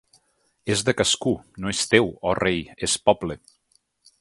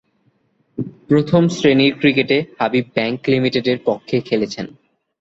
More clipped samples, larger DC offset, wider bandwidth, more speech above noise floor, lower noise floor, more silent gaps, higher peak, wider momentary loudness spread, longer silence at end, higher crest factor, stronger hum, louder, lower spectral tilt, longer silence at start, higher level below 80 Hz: neither; neither; first, 11.5 kHz vs 7.8 kHz; about the same, 44 dB vs 45 dB; first, -66 dBFS vs -62 dBFS; neither; about the same, 0 dBFS vs -2 dBFS; second, 9 LU vs 15 LU; first, 0.85 s vs 0.5 s; first, 24 dB vs 16 dB; neither; second, -22 LUFS vs -17 LUFS; second, -3.5 dB/octave vs -6 dB/octave; second, 0.65 s vs 0.8 s; first, -50 dBFS vs -56 dBFS